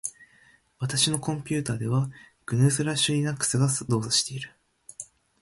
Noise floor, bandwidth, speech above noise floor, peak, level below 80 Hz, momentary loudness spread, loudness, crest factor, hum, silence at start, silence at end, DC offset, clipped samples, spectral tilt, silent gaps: -60 dBFS; 12 kHz; 34 dB; -6 dBFS; -60 dBFS; 18 LU; -25 LUFS; 20 dB; none; 0.05 s; 0.4 s; under 0.1%; under 0.1%; -4 dB/octave; none